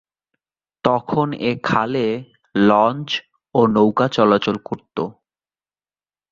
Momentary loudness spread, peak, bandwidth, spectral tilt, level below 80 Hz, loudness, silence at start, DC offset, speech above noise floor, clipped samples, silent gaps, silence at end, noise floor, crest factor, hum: 12 LU; -2 dBFS; 7.4 kHz; -7 dB/octave; -56 dBFS; -19 LUFS; 0.85 s; under 0.1%; over 72 dB; under 0.1%; none; 1.2 s; under -90 dBFS; 18 dB; 50 Hz at -50 dBFS